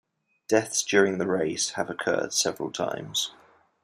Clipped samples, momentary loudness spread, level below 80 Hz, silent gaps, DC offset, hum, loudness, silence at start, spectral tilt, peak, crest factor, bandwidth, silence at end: under 0.1%; 8 LU; -70 dBFS; none; under 0.1%; none; -26 LUFS; 0.5 s; -2.5 dB/octave; -6 dBFS; 22 dB; 15.5 kHz; 0.5 s